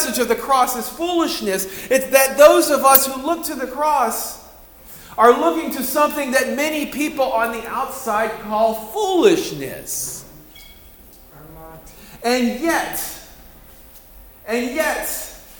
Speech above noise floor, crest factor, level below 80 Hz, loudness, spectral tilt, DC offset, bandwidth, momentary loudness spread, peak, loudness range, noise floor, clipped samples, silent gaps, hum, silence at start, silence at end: 26 dB; 20 dB; -48 dBFS; -18 LUFS; -2.5 dB/octave; under 0.1%; over 20 kHz; 15 LU; 0 dBFS; 9 LU; -44 dBFS; under 0.1%; none; none; 0 s; 0 s